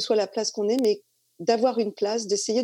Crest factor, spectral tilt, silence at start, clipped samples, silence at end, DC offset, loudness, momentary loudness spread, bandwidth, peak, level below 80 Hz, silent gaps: 16 dB; -3.5 dB/octave; 0 s; under 0.1%; 0 s; under 0.1%; -25 LUFS; 5 LU; 15.5 kHz; -8 dBFS; -80 dBFS; none